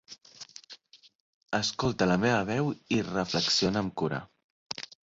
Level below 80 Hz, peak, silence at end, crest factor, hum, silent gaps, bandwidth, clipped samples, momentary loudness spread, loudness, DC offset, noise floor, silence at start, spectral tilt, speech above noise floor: -58 dBFS; -10 dBFS; 0.35 s; 20 dB; none; 1.15-1.41 s, 4.44-4.66 s; 7.8 kHz; under 0.1%; 21 LU; -29 LUFS; under 0.1%; -54 dBFS; 0.1 s; -4.5 dB/octave; 26 dB